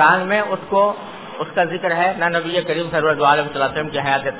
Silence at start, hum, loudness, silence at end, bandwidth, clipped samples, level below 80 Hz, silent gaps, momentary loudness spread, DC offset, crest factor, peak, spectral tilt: 0 s; none; -18 LUFS; 0 s; 4 kHz; under 0.1%; -56 dBFS; none; 6 LU; 0.3%; 18 dB; 0 dBFS; -8.5 dB/octave